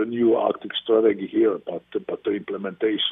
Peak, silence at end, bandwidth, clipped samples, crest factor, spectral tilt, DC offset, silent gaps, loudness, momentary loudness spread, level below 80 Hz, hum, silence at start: -6 dBFS; 0 s; 3.9 kHz; under 0.1%; 16 dB; -8.5 dB/octave; under 0.1%; none; -23 LUFS; 11 LU; -68 dBFS; none; 0 s